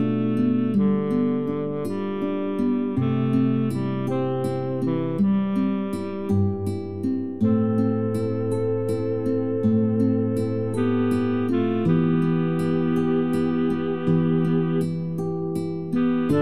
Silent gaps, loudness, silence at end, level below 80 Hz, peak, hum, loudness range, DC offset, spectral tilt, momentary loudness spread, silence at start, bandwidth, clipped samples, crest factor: none; -23 LUFS; 0 s; -56 dBFS; -10 dBFS; none; 2 LU; 0.8%; -9 dB/octave; 6 LU; 0 s; 13 kHz; under 0.1%; 12 dB